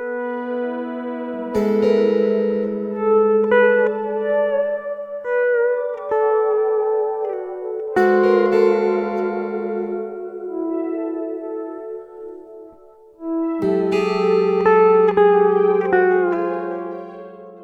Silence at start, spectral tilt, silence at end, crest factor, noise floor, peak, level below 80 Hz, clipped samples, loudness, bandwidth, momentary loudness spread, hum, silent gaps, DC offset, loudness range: 0 s; -7.5 dB/octave; 0 s; 16 dB; -46 dBFS; -2 dBFS; -60 dBFS; under 0.1%; -19 LUFS; 7.6 kHz; 15 LU; none; none; under 0.1%; 10 LU